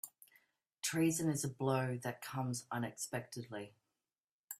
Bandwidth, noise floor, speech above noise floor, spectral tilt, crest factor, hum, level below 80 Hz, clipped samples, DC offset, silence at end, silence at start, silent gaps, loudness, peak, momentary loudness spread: 16 kHz; under -90 dBFS; over 52 dB; -5 dB/octave; 18 dB; none; -78 dBFS; under 0.1%; under 0.1%; 0.05 s; 0.05 s; 4.20-4.24 s, 4.32-4.48 s; -39 LUFS; -22 dBFS; 14 LU